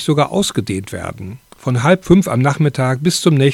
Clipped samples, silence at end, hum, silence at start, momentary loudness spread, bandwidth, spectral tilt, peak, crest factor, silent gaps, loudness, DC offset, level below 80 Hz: under 0.1%; 0 s; none; 0 s; 14 LU; 16 kHz; -6 dB/octave; 0 dBFS; 14 dB; none; -15 LUFS; under 0.1%; -44 dBFS